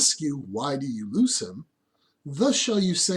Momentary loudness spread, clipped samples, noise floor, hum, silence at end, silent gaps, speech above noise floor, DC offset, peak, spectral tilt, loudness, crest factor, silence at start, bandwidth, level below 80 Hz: 17 LU; under 0.1%; -71 dBFS; none; 0 s; none; 46 dB; under 0.1%; -8 dBFS; -3.5 dB/octave; -25 LUFS; 18 dB; 0 s; 12.5 kHz; -68 dBFS